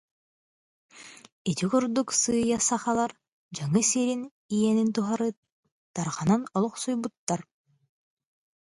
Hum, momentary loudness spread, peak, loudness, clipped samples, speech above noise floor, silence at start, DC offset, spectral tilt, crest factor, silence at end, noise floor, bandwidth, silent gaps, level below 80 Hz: none; 11 LU; -10 dBFS; -27 LUFS; under 0.1%; over 64 dB; 0.95 s; under 0.1%; -4.5 dB/octave; 18 dB; 1.2 s; under -90 dBFS; 11.5 kHz; 1.32-1.45 s, 3.28-3.49 s, 4.31-4.49 s, 5.37-5.43 s, 5.52-5.63 s, 5.72-5.94 s, 7.17-7.27 s; -64 dBFS